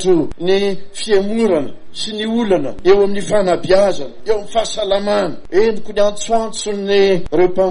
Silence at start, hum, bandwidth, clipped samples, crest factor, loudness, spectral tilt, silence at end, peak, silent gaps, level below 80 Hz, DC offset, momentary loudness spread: 0 s; none; 10.5 kHz; under 0.1%; 14 dB; -16 LUFS; -4.5 dB/octave; 0 s; -2 dBFS; none; -38 dBFS; under 0.1%; 8 LU